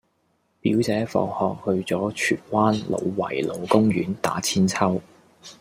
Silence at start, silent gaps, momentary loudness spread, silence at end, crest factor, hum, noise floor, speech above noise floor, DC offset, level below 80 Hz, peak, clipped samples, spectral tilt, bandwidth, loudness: 0.65 s; none; 6 LU; 0.1 s; 20 dB; none; -68 dBFS; 46 dB; under 0.1%; -60 dBFS; -4 dBFS; under 0.1%; -5.5 dB/octave; 16 kHz; -23 LUFS